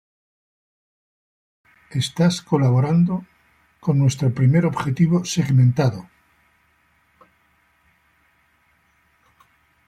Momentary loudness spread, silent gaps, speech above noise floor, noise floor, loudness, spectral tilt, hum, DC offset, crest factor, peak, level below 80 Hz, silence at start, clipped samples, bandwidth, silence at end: 9 LU; none; 44 dB; -62 dBFS; -19 LUFS; -7 dB/octave; none; under 0.1%; 16 dB; -6 dBFS; -58 dBFS; 1.9 s; under 0.1%; 11 kHz; 3.85 s